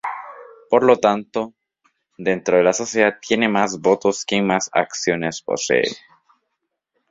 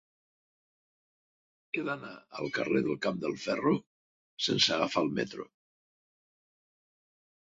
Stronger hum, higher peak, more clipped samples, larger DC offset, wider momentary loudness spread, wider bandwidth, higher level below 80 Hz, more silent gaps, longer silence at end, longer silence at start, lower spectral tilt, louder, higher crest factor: neither; first, 0 dBFS vs -12 dBFS; neither; neither; about the same, 11 LU vs 13 LU; about the same, 7.8 kHz vs 8 kHz; first, -60 dBFS vs -72 dBFS; second, none vs 3.86-4.37 s; second, 1.15 s vs 2.15 s; second, 0.05 s vs 1.75 s; about the same, -4 dB/octave vs -4 dB/octave; first, -19 LUFS vs -31 LUFS; about the same, 20 dB vs 22 dB